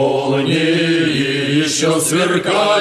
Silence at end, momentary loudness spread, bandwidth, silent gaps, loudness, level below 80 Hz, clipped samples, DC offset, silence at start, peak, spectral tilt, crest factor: 0 s; 2 LU; 13 kHz; none; -15 LUFS; -56 dBFS; under 0.1%; under 0.1%; 0 s; -2 dBFS; -4 dB/octave; 12 dB